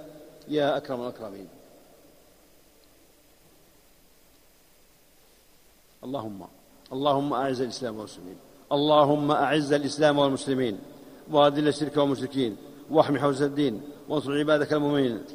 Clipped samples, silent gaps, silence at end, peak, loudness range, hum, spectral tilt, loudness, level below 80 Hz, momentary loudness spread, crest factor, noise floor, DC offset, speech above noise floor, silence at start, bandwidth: under 0.1%; none; 0 s; -4 dBFS; 18 LU; none; -6 dB/octave; -25 LUFS; -64 dBFS; 19 LU; 24 dB; -58 dBFS; under 0.1%; 33 dB; 0 s; 15.5 kHz